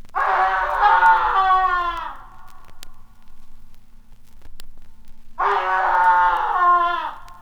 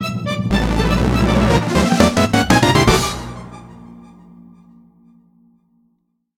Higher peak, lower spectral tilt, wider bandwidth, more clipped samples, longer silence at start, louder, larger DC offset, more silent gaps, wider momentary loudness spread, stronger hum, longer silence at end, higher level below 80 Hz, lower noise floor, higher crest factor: second, -4 dBFS vs 0 dBFS; second, -3.5 dB/octave vs -5 dB/octave; second, 16.5 kHz vs 18.5 kHz; neither; about the same, 0 s vs 0 s; about the same, -17 LUFS vs -15 LUFS; neither; neither; second, 12 LU vs 17 LU; neither; second, 0 s vs 2.35 s; second, -40 dBFS vs -28 dBFS; second, -39 dBFS vs -66 dBFS; about the same, 16 dB vs 18 dB